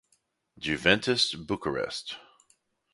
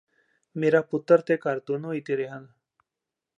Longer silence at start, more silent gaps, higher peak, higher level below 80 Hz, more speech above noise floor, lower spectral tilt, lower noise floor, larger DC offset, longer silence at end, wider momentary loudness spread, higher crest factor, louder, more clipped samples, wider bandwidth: about the same, 0.6 s vs 0.55 s; neither; first, -4 dBFS vs -8 dBFS; first, -58 dBFS vs -80 dBFS; second, 44 dB vs 63 dB; second, -3.5 dB/octave vs -8 dB/octave; second, -72 dBFS vs -87 dBFS; neither; second, 0.7 s vs 0.95 s; about the same, 14 LU vs 14 LU; first, 26 dB vs 20 dB; about the same, -27 LUFS vs -25 LUFS; neither; first, 11.5 kHz vs 7.4 kHz